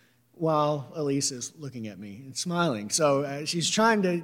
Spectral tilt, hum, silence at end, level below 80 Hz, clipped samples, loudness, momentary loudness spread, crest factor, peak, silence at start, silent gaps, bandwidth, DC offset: -4 dB/octave; none; 0 s; -78 dBFS; under 0.1%; -26 LUFS; 15 LU; 18 dB; -10 dBFS; 0.4 s; none; 16.5 kHz; under 0.1%